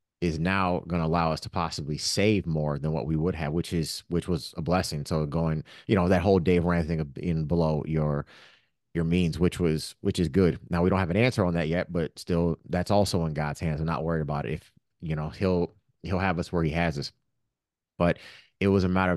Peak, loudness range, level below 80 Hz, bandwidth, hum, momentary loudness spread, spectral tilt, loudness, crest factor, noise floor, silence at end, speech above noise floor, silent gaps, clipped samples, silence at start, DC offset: -8 dBFS; 4 LU; -46 dBFS; 12.5 kHz; none; 8 LU; -6.5 dB/octave; -27 LUFS; 20 dB; -88 dBFS; 0 s; 62 dB; none; under 0.1%; 0.2 s; under 0.1%